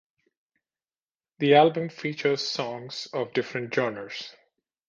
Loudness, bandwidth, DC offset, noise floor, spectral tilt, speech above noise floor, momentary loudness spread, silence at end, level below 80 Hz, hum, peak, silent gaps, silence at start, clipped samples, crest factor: -26 LUFS; 7.6 kHz; under 0.1%; under -90 dBFS; -5 dB/octave; over 65 dB; 17 LU; 0.6 s; -74 dBFS; none; -4 dBFS; none; 1.4 s; under 0.1%; 22 dB